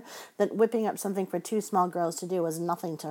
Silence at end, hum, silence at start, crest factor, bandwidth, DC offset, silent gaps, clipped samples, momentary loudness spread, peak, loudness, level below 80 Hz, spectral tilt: 0 s; none; 0 s; 18 dB; 17 kHz; under 0.1%; none; under 0.1%; 6 LU; -12 dBFS; -29 LUFS; under -90 dBFS; -5.5 dB/octave